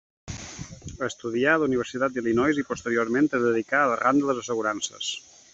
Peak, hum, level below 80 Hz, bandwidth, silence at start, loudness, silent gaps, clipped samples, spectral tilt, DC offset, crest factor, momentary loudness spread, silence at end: -8 dBFS; none; -56 dBFS; 8 kHz; 0.25 s; -25 LUFS; none; under 0.1%; -4.5 dB/octave; under 0.1%; 18 dB; 16 LU; 0.35 s